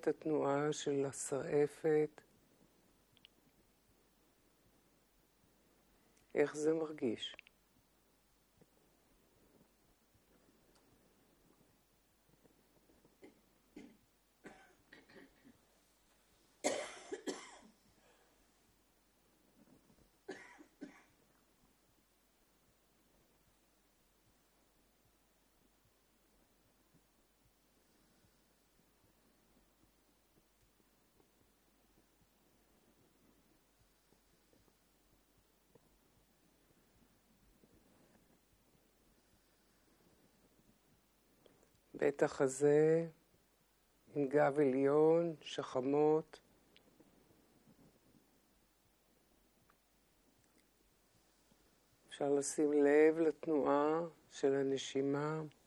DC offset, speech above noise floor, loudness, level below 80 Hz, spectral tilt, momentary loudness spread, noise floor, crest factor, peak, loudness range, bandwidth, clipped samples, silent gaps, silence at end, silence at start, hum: under 0.1%; 40 dB; -36 LUFS; -80 dBFS; -5 dB/octave; 20 LU; -74 dBFS; 24 dB; -18 dBFS; 25 LU; 13 kHz; under 0.1%; none; 0.2 s; 0.05 s; none